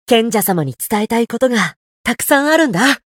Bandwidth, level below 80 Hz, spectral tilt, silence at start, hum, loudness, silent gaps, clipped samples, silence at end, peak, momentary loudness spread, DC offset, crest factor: 18.5 kHz; -52 dBFS; -4 dB/octave; 0.1 s; none; -15 LUFS; 1.76-2.04 s; under 0.1%; 0.2 s; 0 dBFS; 8 LU; under 0.1%; 16 dB